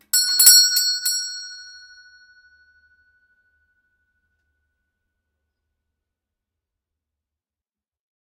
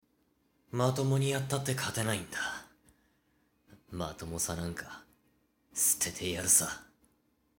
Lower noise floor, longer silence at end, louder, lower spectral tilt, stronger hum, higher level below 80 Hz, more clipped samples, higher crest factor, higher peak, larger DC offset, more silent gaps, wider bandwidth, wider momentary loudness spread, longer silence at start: first, under -90 dBFS vs -73 dBFS; first, 6.65 s vs 0.75 s; first, -13 LUFS vs -31 LUFS; second, 6 dB/octave vs -3.5 dB/octave; neither; second, -78 dBFS vs -60 dBFS; neither; about the same, 24 dB vs 24 dB; first, 0 dBFS vs -12 dBFS; neither; neither; about the same, 15.5 kHz vs 17 kHz; first, 22 LU vs 18 LU; second, 0.15 s vs 0.75 s